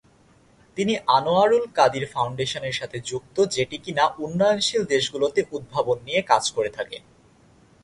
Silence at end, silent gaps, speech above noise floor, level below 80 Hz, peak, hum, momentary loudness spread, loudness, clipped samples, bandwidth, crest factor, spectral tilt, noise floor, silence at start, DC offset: 0.85 s; none; 34 dB; -60 dBFS; -4 dBFS; none; 10 LU; -23 LUFS; under 0.1%; 11.5 kHz; 20 dB; -4 dB/octave; -56 dBFS; 0.75 s; under 0.1%